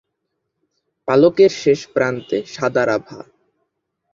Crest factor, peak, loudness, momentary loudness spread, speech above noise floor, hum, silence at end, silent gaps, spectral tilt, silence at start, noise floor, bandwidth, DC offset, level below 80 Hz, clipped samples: 18 dB; -2 dBFS; -17 LUFS; 11 LU; 59 dB; none; 0.9 s; none; -5.5 dB/octave; 1.05 s; -75 dBFS; 7.6 kHz; under 0.1%; -60 dBFS; under 0.1%